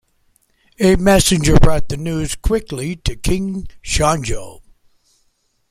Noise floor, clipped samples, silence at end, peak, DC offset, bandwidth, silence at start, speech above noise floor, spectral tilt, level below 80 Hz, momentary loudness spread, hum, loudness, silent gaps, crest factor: -63 dBFS; under 0.1%; 1.2 s; -2 dBFS; under 0.1%; 15.5 kHz; 0.8 s; 48 dB; -5 dB/octave; -24 dBFS; 13 LU; none; -17 LUFS; none; 16 dB